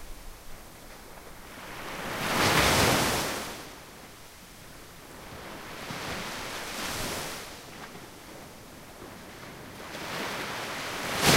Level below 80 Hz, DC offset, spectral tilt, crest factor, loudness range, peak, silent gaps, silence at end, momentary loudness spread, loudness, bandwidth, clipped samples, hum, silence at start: -48 dBFS; under 0.1%; -3 dB/octave; 26 dB; 12 LU; -6 dBFS; none; 0 s; 23 LU; -29 LUFS; 16 kHz; under 0.1%; none; 0 s